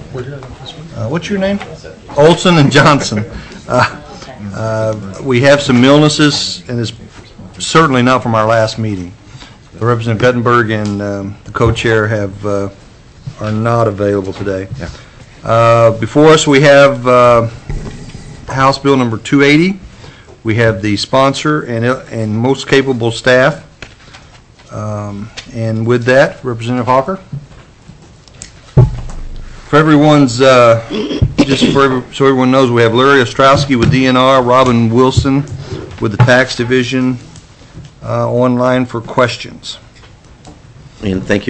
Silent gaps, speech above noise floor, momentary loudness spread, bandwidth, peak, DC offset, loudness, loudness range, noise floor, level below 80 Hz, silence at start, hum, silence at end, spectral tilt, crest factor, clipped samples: none; 29 dB; 18 LU; 8.6 kHz; 0 dBFS; under 0.1%; -11 LUFS; 7 LU; -39 dBFS; -34 dBFS; 0 s; none; 0 s; -5.5 dB/octave; 12 dB; under 0.1%